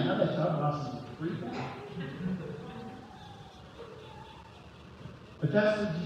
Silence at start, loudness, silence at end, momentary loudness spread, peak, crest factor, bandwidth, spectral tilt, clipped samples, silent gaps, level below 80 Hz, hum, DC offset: 0 s; -33 LUFS; 0 s; 21 LU; -14 dBFS; 20 dB; 9.2 kHz; -7.5 dB/octave; under 0.1%; none; -62 dBFS; none; under 0.1%